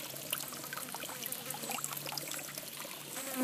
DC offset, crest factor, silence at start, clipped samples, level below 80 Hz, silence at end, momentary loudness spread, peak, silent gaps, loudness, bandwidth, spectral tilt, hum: under 0.1%; 26 dB; 0 s; under 0.1%; -80 dBFS; 0 s; 5 LU; -16 dBFS; none; -39 LUFS; 16 kHz; -1.5 dB/octave; none